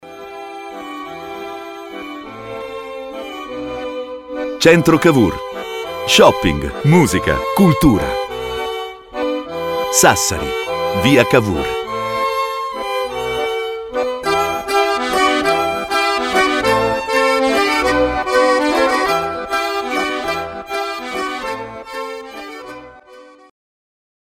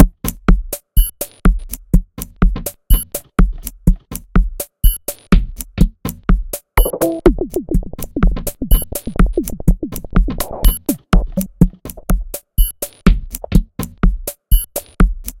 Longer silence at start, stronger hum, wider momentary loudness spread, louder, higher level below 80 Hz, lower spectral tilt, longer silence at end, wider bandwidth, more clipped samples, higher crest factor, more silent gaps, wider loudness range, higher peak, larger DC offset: about the same, 0.05 s vs 0 s; neither; first, 17 LU vs 7 LU; first, -16 LUFS vs -19 LUFS; second, -38 dBFS vs -16 dBFS; second, -4 dB/octave vs -6 dB/octave; first, 0.95 s vs 0.1 s; about the same, 17 kHz vs 17 kHz; second, under 0.1% vs 0.3%; about the same, 18 dB vs 14 dB; neither; first, 13 LU vs 1 LU; about the same, 0 dBFS vs 0 dBFS; neither